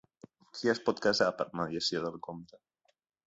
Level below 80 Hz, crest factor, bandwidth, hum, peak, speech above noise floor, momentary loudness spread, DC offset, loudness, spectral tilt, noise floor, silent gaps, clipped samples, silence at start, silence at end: -70 dBFS; 22 dB; 8 kHz; none; -12 dBFS; 44 dB; 17 LU; under 0.1%; -32 LUFS; -4 dB/octave; -77 dBFS; none; under 0.1%; 0.55 s; 0.7 s